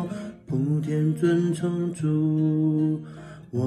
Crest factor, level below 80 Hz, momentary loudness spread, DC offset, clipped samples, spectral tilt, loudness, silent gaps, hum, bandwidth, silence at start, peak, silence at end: 12 dB; -62 dBFS; 11 LU; under 0.1%; under 0.1%; -8.5 dB/octave; -25 LUFS; none; none; 11 kHz; 0 s; -12 dBFS; 0 s